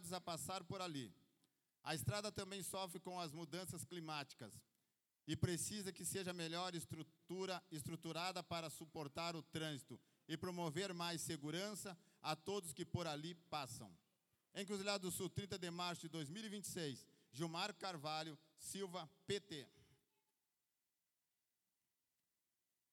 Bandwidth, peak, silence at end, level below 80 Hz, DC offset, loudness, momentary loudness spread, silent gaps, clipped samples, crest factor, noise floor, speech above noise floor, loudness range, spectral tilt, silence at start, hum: 18 kHz; -26 dBFS; 3 s; -76 dBFS; under 0.1%; -48 LUFS; 11 LU; none; under 0.1%; 22 dB; under -90 dBFS; over 42 dB; 4 LU; -4 dB/octave; 0 s; none